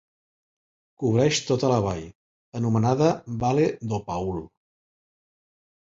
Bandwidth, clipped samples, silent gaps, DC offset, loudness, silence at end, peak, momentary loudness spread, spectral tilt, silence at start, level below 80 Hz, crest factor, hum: 7.8 kHz; under 0.1%; 2.15-2.52 s; under 0.1%; -24 LUFS; 1.4 s; -6 dBFS; 12 LU; -6 dB/octave; 1 s; -52 dBFS; 20 dB; none